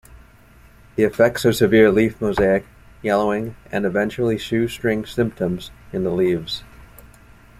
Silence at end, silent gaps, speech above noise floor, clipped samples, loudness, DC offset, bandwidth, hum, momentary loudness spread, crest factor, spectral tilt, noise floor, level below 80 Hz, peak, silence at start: 0.55 s; none; 29 dB; under 0.1%; -20 LUFS; under 0.1%; 15.5 kHz; none; 12 LU; 18 dB; -6 dB/octave; -48 dBFS; -46 dBFS; -2 dBFS; 0.95 s